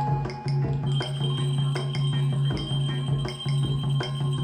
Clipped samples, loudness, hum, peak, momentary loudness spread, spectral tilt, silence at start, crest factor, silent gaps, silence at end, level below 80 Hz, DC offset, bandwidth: under 0.1%; -27 LUFS; none; -14 dBFS; 2 LU; -6.5 dB/octave; 0 s; 10 dB; none; 0 s; -46 dBFS; under 0.1%; 9.8 kHz